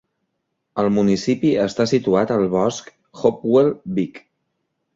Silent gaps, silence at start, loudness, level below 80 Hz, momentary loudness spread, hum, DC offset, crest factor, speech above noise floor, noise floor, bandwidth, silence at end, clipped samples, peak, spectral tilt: none; 0.75 s; -19 LUFS; -56 dBFS; 8 LU; none; under 0.1%; 18 dB; 57 dB; -75 dBFS; 7.8 kHz; 0.8 s; under 0.1%; -2 dBFS; -6.5 dB/octave